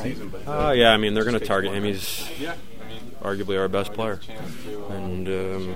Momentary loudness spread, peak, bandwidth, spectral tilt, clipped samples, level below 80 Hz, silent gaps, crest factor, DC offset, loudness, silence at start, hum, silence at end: 19 LU; 0 dBFS; 16 kHz; -4.5 dB/octave; under 0.1%; -42 dBFS; none; 24 dB; 3%; -24 LUFS; 0 s; none; 0 s